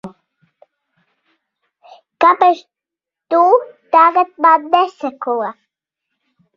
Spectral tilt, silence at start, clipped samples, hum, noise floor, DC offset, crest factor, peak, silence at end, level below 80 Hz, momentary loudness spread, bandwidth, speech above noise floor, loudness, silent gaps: -5 dB/octave; 0.05 s; under 0.1%; none; -85 dBFS; under 0.1%; 16 dB; 0 dBFS; 1.05 s; -68 dBFS; 11 LU; 7 kHz; 72 dB; -14 LUFS; none